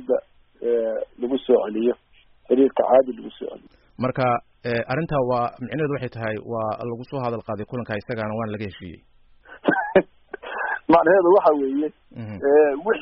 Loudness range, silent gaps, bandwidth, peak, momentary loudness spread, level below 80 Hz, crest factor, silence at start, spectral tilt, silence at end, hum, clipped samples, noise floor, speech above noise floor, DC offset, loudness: 8 LU; none; 5.6 kHz; -4 dBFS; 17 LU; -54 dBFS; 18 dB; 0 s; -5.5 dB/octave; 0 s; none; under 0.1%; -48 dBFS; 26 dB; under 0.1%; -22 LUFS